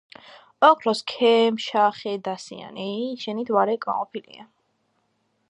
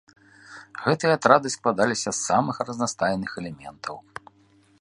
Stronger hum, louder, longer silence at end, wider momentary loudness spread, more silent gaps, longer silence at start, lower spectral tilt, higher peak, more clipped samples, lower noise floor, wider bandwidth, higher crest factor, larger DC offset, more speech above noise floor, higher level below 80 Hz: neither; about the same, -22 LUFS vs -23 LUFS; first, 1.05 s vs 0.8 s; second, 16 LU vs 21 LU; neither; about the same, 0.6 s vs 0.5 s; about the same, -4.5 dB/octave vs -4 dB/octave; about the same, -2 dBFS vs 0 dBFS; neither; first, -70 dBFS vs -59 dBFS; about the same, 10.5 kHz vs 11.5 kHz; about the same, 22 dB vs 24 dB; neither; first, 48 dB vs 35 dB; second, -78 dBFS vs -62 dBFS